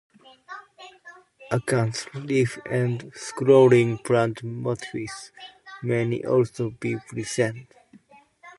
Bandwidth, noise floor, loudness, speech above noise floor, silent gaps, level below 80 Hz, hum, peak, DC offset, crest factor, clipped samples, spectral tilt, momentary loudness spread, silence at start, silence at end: 11.5 kHz; -54 dBFS; -24 LUFS; 31 dB; none; -62 dBFS; none; -6 dBFS; under 0.1%; 20 dB; under 0.1%; -6 dB/octave; 24 LU; 0.5 s; 0.05 s